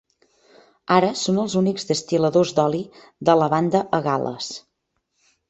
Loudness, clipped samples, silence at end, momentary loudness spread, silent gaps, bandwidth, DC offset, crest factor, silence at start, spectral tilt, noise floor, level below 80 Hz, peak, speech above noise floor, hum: -21 LUFS; under 0.1%; 0.9 s; 13 LU; none; 8.2 kHz; under 0.1%; 20 dB; 0.9 s; -5.5 dB/octave; -75 dBFS; -62 dBFS; -2 dBFS; 54 dB; none